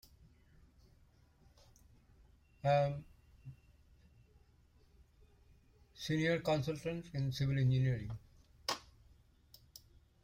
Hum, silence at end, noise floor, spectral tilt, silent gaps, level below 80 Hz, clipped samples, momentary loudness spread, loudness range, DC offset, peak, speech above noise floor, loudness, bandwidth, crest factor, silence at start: none; 1.45 s; -67 dBFS; -6.5 dB/octave; none; -62 dBFS; under 0.1%; 25 LU; 5 LU; under 0.1%; -22 dBFS; 33 dB; -37 LUFS; 16 kHz; 20 dB; 2.65 s